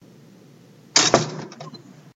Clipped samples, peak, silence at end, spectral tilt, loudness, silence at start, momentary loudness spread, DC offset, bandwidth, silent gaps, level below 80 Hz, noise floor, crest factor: under 0.1%; 0 dBFS; 0.25 s; -2 dB/octave; -18 LUFS; 0.95 s; 24 LU; under 0.1%; 15 kHz; none; -58 dBFS; -49 dBFS; 24 dB